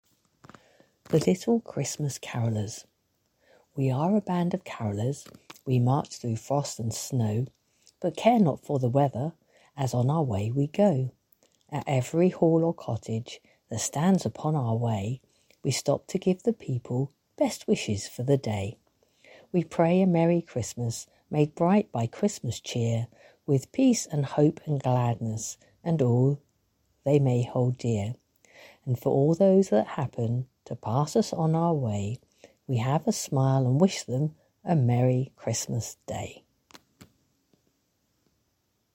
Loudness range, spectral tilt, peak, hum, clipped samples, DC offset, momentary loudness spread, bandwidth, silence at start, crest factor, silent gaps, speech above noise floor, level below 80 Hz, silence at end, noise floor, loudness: 4 LU; -6.5 dB/octave; -6 dBFS; none; under 0.1%; under 0.1%; 13 LU; 16.5 kHz; 1.1 s; 20 dB; none; 48 dB; -64 dBFS; 2.6 s; -74 dBFS; -27 LUFS